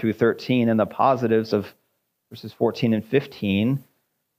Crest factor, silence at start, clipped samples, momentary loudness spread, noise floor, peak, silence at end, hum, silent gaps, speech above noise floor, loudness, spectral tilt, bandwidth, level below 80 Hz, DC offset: 16 dB; 0 s; under 0.1%; 9 LU; -73 dBFS; -6 dBFS; 0.6 s; none; none; 52 dB; -22 LUFS; -8 dB/octave; 15.5 kHz; -68 dBFS; under 0.1%